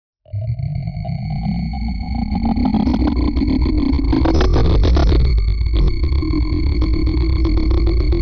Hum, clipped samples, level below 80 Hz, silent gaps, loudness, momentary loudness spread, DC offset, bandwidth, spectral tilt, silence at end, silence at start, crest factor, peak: none; under 0.1%; -18 dBFS; none; -18 LUFS; 8 LU; under 0.1%; 5.4 kHz; -8.5 dB/octave; 0 s; 0.35 s; 8 dB; -8 dBFS